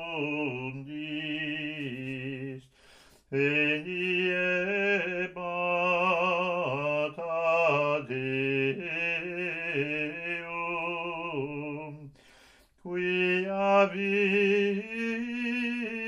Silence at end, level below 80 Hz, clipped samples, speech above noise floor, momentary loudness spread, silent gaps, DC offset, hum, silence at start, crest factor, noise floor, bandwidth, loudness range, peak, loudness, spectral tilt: 0 s; -68 dBFS; under 0.1%; 30 dB; 11 LU; none; under 0.1%; none; 0 s; 18 dB; -59 dBFS; 11 kHz; 6 LU; -12 dBFS; -29 LUFS; -6.5 dB/octave